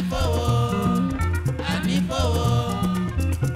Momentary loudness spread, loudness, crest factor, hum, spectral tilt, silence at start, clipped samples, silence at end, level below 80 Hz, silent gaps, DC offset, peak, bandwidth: 3 LU; -23 LUFS; 12 dB; none; -6.5 dB/octave; 0 s; under 0.1%; 0 s; -32 dBFS; none; under 0.1%; -10 dBFS; 15.5 kHz